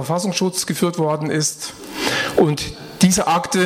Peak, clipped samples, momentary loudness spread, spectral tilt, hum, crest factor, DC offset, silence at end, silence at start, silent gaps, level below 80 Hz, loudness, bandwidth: -2 dBFS; under 0.1%; 9 LU; -4 dB/octave; none; 16 dB; under 0.1%; 0 s; 0 s; none; -48 dBFS; -19 LUFS; 16.5 kHz